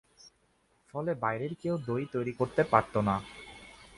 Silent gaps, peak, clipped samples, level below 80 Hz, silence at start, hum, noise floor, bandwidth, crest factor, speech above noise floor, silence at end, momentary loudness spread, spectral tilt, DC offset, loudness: none; -6 dBFS; under 0.1%; -60 dBFS; 0.25 s; none; -70 dBFS; 11.5 kHz; 26 dB; 40 dB; 0.15 s; 20 LU; -7.5 dB/octave; under 0.1%; -31 LUFS